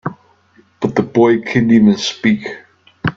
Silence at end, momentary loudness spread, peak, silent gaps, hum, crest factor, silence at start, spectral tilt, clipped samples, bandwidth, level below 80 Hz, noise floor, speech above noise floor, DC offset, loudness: 0.05 s; 16 LU; 0 dBFS; none; none; 14 dB; 0.05 s; -6 dB/octave; under 0.1%; 7.6 kHz; -50 dBFS; -52 dBFS; 39 dB; under 0.1%; -14 LUFS